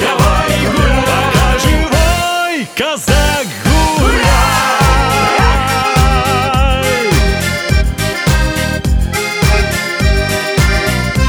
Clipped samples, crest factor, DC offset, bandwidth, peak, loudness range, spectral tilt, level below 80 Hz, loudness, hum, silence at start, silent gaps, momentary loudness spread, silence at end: under 0.1%; 12 dB; under 0.1%; over 20 kHz; 0 dBFS; 2 LU; -4.5 dB/octave; -16 dBFS; -12 LUFS; none; 0 s; none; 4 LU; 0 s